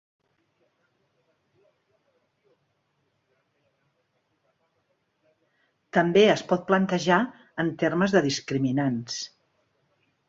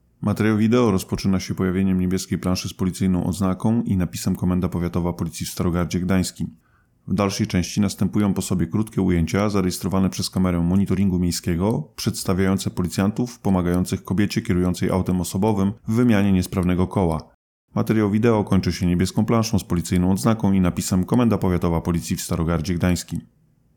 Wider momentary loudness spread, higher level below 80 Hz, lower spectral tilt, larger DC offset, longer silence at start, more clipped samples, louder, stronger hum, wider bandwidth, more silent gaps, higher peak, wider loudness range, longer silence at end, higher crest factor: first, 12 LU vs 6 LU; second, -68 dBFS vs -42 dBFS; about the same, -5.5 dB/octave vs -6.5 dB/octave; neither; first, 5.95 s vs 0.2 s; neither; second, -24 LUFS vs -21 LUFS; neither; second, 7.8 kHz vs 19 kHz; second, none vs 17.34-17.68 s; about the same, -6 dBFS vs -6 dBFS; about the same, 4 LU vs 3 LU; first, 1 s vs 0.5 s; first, 22 dB vs 14 dB